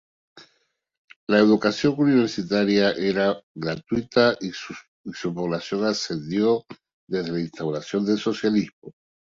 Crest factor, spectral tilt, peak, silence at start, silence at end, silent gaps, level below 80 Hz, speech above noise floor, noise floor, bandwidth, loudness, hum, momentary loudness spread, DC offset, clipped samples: 20 dB; -5.5 dB/octave; -4 dBFS; 0.35 s; 0.45 s; 0.98-1.08 s, 1.16-1.27 s, 3.43-3.55 s, 4.88-5.04 s, 6.93-7.07 s, 8.73-8.82 s; -60 dBFS; 48 dB; -70 dBFS; 7.6 kHz; -23 LUFS; none; 12 LU; under 0.1%; under 0.1%